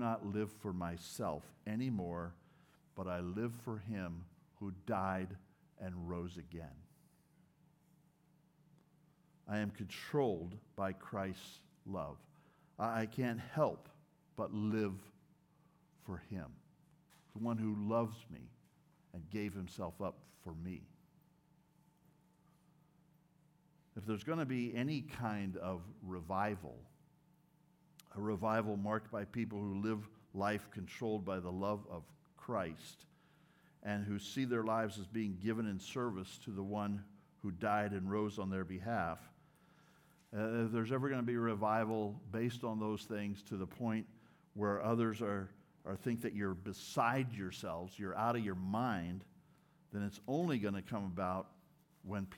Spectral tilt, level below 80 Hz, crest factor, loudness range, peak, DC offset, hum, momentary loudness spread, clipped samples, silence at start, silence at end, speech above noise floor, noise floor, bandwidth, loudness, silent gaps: -7 dB/octave; -74 dBFS; 22 dB; 9 LU; -20 dBFS; under 0.1%; none; 15 LU; under 0.1%; 0 s; 0 s; 32 dB; -72 dBFS; 17.5 kHz; -41 LUFS; none